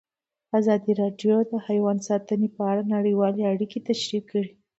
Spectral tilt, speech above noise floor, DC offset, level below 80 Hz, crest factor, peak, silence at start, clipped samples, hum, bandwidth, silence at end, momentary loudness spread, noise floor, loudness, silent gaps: -6.5 dB/octave; 22 dB; under 0.1%; -72 dBFS; 14 dB; -10 dBFS; 0.55 s; under 0.1%; none; 8 kHz; 0.3 s; 5 LU; -46 dBFS; -24 LUFS; none